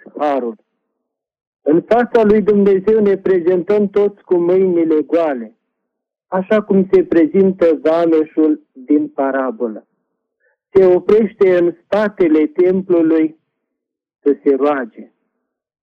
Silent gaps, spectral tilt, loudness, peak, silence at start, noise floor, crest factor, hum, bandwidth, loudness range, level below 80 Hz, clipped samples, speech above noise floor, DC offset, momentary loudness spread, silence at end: 1.47-1.53 s; -9.5 dB/octave; -14 LUFS; -2 dBFS; 0.15 s; -79 dBFS; 14 dB; none; 5.6 kHz; 3 LU; -52 dBFS; under 0.1%; 65 dB; under 0.1%; 9 LU; 0.8 s